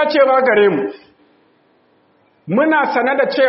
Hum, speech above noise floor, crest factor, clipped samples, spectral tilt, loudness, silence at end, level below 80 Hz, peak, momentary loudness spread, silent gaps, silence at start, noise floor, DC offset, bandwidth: none; 42 dB; 16 dB; under 0.1%; -3 dB/octave; -14 LUFS; 0 s; -66 dBFS; 0 dBFS; 9 LU; none; 0 s; -56 dBFS; under 0.1%; 5.8 kHz